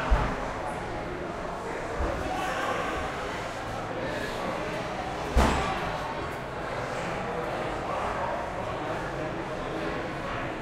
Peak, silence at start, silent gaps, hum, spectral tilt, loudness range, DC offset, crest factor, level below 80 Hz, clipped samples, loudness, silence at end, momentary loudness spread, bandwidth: -10 dBFS; 0 s; none; none; -5.5 dB/octave; 2 LU; under 0.1%; 22 dB; -38 dBFS; under 0.1%; -31 LUFS; 0 s; 6 LU; 15.5 kHz